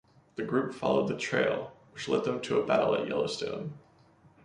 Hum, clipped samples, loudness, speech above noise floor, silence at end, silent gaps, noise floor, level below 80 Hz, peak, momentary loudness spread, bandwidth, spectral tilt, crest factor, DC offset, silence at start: none; under 0.1%; -30 LUFS; 31 dB; 0.65 s; none; -61 dBFS; -68 dBFS; -12 dBFS; 13 LU; 11 kHz; -5.5 dB/octave; 20 dB; under 0.1%; 0.35 s